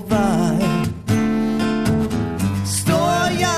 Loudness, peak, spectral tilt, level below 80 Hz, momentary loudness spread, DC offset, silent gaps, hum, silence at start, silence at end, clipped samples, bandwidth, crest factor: -19 LUFS; -6 dBFS; -5.5 dB/octave; -38 dBFS; 4 LU; under 0.1%; none; none; 0 s; 0 s; under 0.1%; 14 kHz; 12 dB